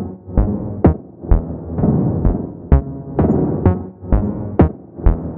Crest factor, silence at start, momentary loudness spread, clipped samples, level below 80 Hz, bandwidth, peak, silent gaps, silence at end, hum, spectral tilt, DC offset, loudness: 16 dB; 0 s; 6 LU; under 0.1%; -22 dBFS; 3.1 kHz; 0 dBFS; none; 0 s; none; -13.5 dB/octave; under 0.1%; -18 LUFS